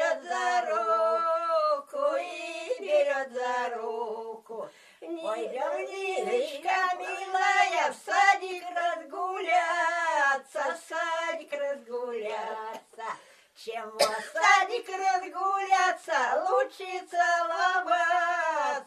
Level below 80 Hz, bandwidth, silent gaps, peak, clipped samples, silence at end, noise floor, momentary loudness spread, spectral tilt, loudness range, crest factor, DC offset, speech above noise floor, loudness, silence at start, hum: -88 dBFS; 13.5 kHz; none; -8 dBFS; under 0.1%; 0 s; -52 dBFS; 14 LU; -0.5 dB/octave; 7 LU; 20 dB; under 0.1%; 24 dB; -28 LUFS; 0 s; none